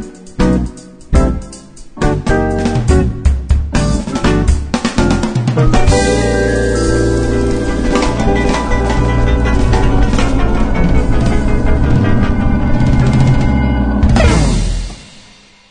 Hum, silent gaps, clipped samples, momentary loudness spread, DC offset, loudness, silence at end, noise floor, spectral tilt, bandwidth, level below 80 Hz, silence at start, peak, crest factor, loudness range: none; none; under 0.1%; 5 LU; under 0.1%; -14 LUFS; 0.5 s; -42 dBFS; -6.5 dB/octave; 10 kHz; -16 dBFS; 0 s; 0 dBFS; 12 dB; 2 LU